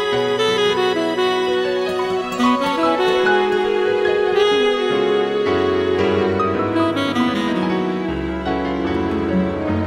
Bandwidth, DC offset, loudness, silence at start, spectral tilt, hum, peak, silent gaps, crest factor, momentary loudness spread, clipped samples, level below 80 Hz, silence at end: 13.5 kHz; under 0.1%; -18 LUFS; 0 s; -5.5 dB/octave; none; -6 dBFS; none; 12 dB; 5 LU; under 0.1%; -42 dBFS; 0 s